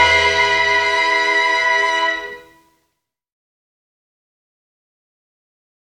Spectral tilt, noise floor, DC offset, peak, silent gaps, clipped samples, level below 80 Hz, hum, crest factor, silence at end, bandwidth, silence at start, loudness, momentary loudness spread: -1 dB/octave; -73 dBFS; under 0.1%; -2 dBFS; none; under 0.1%; -48 dBFS; none; 18 dB; 3.55 s; 14 kHz; 0 s; -14 LUFS; 7 LU